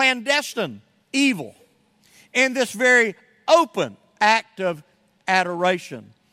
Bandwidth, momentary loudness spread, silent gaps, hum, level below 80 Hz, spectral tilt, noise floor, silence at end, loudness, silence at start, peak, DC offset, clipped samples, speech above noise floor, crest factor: 16 kHz; 15 LU; none; none; -74 dBFS; -3 dB/octave; -59 dBFS; 0.3 s; -20 LUFS; 0 s; -2 dBFS; under 0.1%; under 0.1%; 39 dB; 20 dB